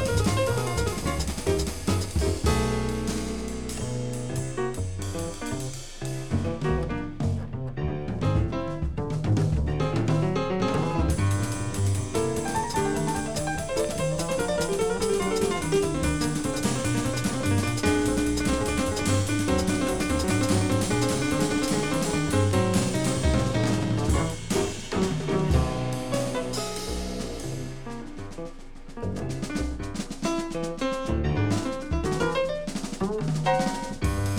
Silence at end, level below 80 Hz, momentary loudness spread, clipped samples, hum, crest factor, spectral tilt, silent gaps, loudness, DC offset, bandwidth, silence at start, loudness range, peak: 0 s; -36 dBFS; 8 LU; under 0.1%; none; 16 dB; -5.5 dB/octave; none; -27 LUFS; under 0.1%; over 20 kHz; 0 s; 7 LU; -10 dBFS